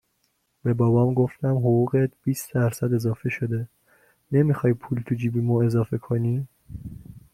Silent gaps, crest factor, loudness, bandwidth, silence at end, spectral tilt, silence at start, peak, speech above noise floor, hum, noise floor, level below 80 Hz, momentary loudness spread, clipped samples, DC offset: none; 16 dB; -24 LUFS; 15 kHz; 0.15 s; -8.5 dB/octave; 0.65 s; -8 dBFS; 49 dB; none; -71 dBFS; -54 dBFS; 15 LU; under 0.1%; under 0.1%